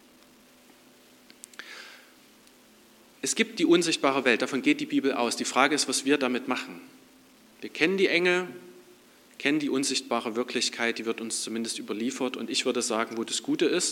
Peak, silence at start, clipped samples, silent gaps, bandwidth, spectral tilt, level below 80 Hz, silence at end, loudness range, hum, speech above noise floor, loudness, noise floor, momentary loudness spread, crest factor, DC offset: -4 dBFS; 1.6 s; under 0.1%; none; 17 kHz; -2.5 dB/octave; -82 dBFS; 0 s; 4 LU; none; 30 dB; -26 LUFS; -56 dBFS; 18 LU; 24 dB; under 0.1%